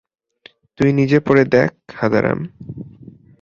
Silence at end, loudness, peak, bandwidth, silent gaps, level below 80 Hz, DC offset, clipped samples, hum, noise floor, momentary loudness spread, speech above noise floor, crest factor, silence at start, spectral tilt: 0.55 s; -16 LUFS; -2 dBFS; 7.2 kHz; none; -50 dBFS; under 0.1%; under 0.1%; none; -49 dBFS; 20 LU; 33 dB; 16 dB; 0.8 s; -8 dB/octave